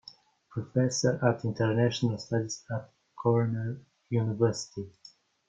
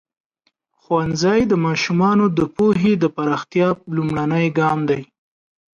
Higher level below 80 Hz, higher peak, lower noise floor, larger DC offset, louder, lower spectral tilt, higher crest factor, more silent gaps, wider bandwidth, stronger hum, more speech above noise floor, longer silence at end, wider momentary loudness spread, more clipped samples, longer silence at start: second, -66 dBFS vs -50 dBFS; second, -10 dBFS vs -6 dBFS; second, -55 dBFS vs -69 dBFS; neither; second, -30 LUFS vs -18 LUFS; about the same, -6 dB/octave vs -6.5 dB/octave; first, 20 dB vs 14 dB; neither; about the same, 7.8 kHz vs 7.4 kHz; neither; second, 26 dB vs 51 dB; second, 0.6 s vs 0.75 s; first, 13 LU vs 6 LU; neither; second, 0.5 s vs 0.9 s